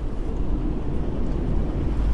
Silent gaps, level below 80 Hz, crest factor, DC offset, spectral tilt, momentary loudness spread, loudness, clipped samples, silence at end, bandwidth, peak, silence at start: none; -26 dBFS; 12 dB; under 0.1%; -9 dB/octave; 3 LU; -28 LUFS; under 0.1%; 0 s; 6 kHz; -10 dBFS; 0 s